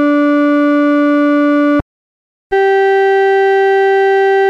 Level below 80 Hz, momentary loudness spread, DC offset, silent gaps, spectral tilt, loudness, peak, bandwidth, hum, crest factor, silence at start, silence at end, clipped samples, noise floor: -46 dBFS; 3 LU; under 0.1%; 1.82-2.50 s; -6 dB/octave; -11 LUFS; -4 dBFS; 7 kHz; none; 6 dB; 0 s; 0 s; under 0.1%; under -90 dBFS